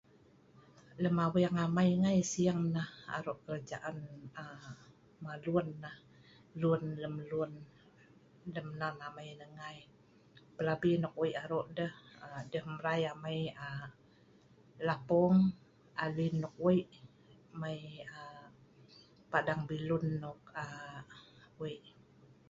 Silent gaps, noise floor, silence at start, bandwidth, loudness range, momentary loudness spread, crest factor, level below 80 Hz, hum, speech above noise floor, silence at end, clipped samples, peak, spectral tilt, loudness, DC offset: none; -64 dBFS; 0.9 s; 7.8 kHz; 8 LU; 21 LU; 22 dB; -68 dBFS; none; 29 dB; 0.6 s; under 0.1%; -16 dBFS; -6.5 dB/octave; -36 LUFS; under 0.1%